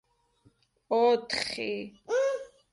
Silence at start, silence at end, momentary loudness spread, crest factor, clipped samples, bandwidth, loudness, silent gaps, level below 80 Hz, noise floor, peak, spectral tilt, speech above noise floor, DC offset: 0.9 s; 0.25 s; 11 LU; 18 dB; under 0.1%; 11.5 kHz; -29 LUFS; none; -68 dBFS; -66 dBFS; -14 dBFS; -3 dB/octave; 38 dB; under 0.1%